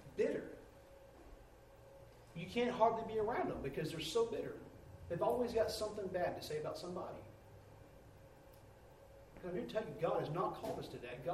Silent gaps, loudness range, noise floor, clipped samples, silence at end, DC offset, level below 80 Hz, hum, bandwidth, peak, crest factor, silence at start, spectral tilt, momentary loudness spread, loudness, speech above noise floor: none; 9 LU; -61 dBFS; under 0.1%; 0 s; under 0.1%; -64 dBFS; none; 15.5 kHz; -18 dBFS; 22 dB; 0 s; -5.5 dB/octave; 24 LU; -40 LUFS; 21 dB